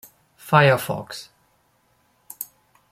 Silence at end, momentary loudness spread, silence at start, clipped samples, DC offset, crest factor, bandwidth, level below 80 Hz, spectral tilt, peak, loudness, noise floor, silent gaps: 0.45 s; 24 LU; 0.45 s; under 0.1%; under 0.1%; 22 dB; 16 kHz; -62 dBFS; -5.5 dB/octave; -2 dBFS; -19 LUFS; -64 dBFS; none